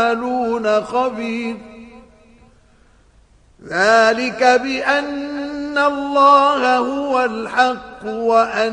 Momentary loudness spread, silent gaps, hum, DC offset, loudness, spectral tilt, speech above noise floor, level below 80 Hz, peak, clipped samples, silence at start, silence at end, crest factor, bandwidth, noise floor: 13 LU; none; none; under 0.1%; -16 LUFS; -3.5 dB/octave; 35 dB; -54 dBFS; 0 dBFS; under 0.1%; 0 s; 0 s; 16 dB; 10.5 kHz; -51 dBFS